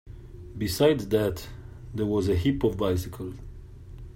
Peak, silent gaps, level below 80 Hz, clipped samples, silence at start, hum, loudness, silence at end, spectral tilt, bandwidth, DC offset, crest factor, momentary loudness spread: -8 dBFS; none; -44 dBFS; under 0.1%; 0.05 s; none; -26 LUFS; 0 s; -6.5 dB/octave; 16 kHz; under 0.1%; 20 dB; 23 LU